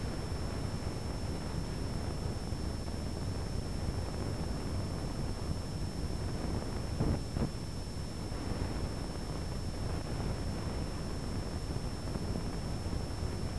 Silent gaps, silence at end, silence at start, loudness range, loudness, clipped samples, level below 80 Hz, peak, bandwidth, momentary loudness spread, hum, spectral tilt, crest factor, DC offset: none; 0 s; 0 s; 1 LU; -38 LUFS; under 0.1%; -42 dBFS; -20 dBFS; 11 kHz; 2 LU; none; -6 dB/octave; 16 dB; 0.5%